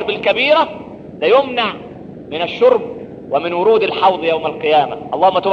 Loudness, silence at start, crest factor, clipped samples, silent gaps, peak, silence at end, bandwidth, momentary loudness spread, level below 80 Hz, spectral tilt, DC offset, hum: -15 LUFS; 0 s; 14 dB; under 0.1%; none; 0 dBFS; 0 s; 6.6 kHz; 18 LU; -54 dBFS; -6 dB/octave; under 0.1%; none